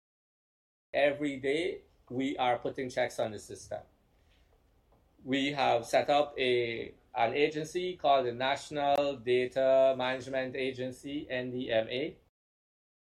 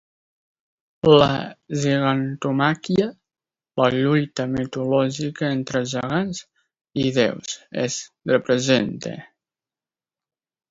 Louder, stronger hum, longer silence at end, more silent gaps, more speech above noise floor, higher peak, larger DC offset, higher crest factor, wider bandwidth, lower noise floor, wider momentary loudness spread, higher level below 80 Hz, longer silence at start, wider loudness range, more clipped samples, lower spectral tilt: second, -31 LUFS vs -21 LUFS; neither; second, 1.05 s vs 1.45 s; second, none vs 6.81-6.85 s; second, 36 dB vs over 69 dB; second, -14 dBFS vs -2 dBFS; neither; about the same, 18 dB vs 20 dB; first, 13 kHz vs 7.8 kHz; second, -67 dBFS vs under -90 dBFS; about the same, 13 LU vs 11 LU; second, -68 dBFS vs -56 dBFS; about the same, 0.95 s vs 1.05 s; first, 7 LU vs 4 LU; neither; about the same, -4.5 dB/octave vs -5.5 dB/octave